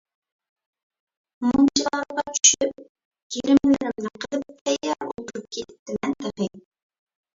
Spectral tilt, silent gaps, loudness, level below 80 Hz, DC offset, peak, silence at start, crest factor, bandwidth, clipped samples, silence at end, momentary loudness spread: -2.5 dB/octave; 2.89-2.95 s, 3.05-3.11 s, 3.22-3.30 s, 4.61-4.66 s, 5.79-5.86 s; -23 LUFS; -58 dBFS; under 0.1%; 0 dBFS; 1.4 s; 24 dB; 7.8 kHz; under 0.1%; 0.8 s; 17 LU